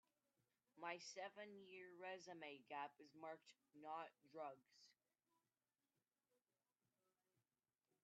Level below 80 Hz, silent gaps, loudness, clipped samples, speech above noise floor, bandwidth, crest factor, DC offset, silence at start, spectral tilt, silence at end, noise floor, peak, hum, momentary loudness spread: under -90 dBFS; none; -57 LUFS; under 0.1%; over 32 dB; 7.4 kHz; 22 dB; under 0.1%; 0.75 s; -1.5 dB/octave; 3.1 s; under -90 dBFS; -38 dBFS; none; 7 LU